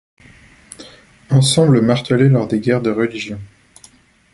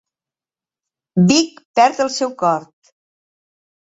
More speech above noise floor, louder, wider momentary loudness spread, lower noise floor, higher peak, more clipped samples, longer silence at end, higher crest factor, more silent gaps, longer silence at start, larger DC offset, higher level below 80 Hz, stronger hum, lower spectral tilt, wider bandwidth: second, 34 dB vs over 74 dB; about the same, -15 LUFS vs -17 LUFS; first, 22 LU vs 8 LU; second, -48 dBFS vs under -90 dBFS; about the same, 0 dBFS vs -2 dBFS; neither; second, 0.9 s vs 1.3 s; about the same, 16 dB vs 18 dB; second, none vs 1.65-1.74 s; second, 0.8 s vs 1.15 s; neither; first, -50 dBFS vs -62 dBFS; neither; about the same, -6 dB/octave vs -5 dB/octave; first, 11.5 kHz vs 8 kHz